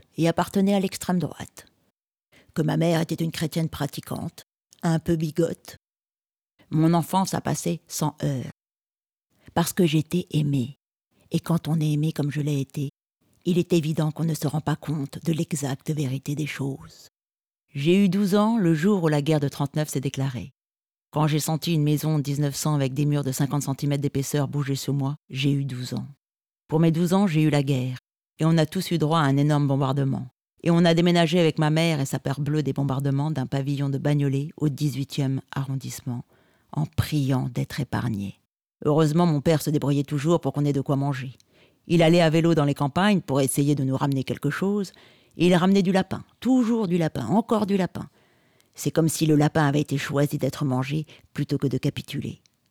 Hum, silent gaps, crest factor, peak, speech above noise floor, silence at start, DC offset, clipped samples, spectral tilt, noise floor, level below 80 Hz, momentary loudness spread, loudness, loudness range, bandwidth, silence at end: none; none; 16 dB; -8 dBFS; over 67 dB; 0.2 s; under 0.1%; under 0.1%; -6.5 dB/octave; under -90 dBFS; -58 dBFS; 11 LU; -24 LUFS; 5 LU; 17.5 kHz; 0.35 s